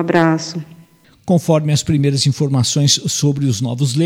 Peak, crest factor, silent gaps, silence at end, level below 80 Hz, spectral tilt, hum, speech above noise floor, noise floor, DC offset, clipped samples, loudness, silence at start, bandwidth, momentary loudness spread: 0 dBFS; 16 dB; none; 0 s; -48 dBFS; -5 dB/octave; none; 32 dB; -47 dBFS; under 0.1%; under 0.1%; -15 LUFS; 0 s; 15.5 kHz; 6 LU